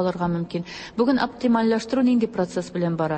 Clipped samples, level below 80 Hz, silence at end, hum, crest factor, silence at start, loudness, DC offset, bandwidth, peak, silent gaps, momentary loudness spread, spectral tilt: under 0.1%; -54 dBFS; 0 s; none; 14 dB; 0 s; -23 LUFS; under 0.1%; 8.8 kHz; -8 dBFS; none; 8 LU; -7 dB/octave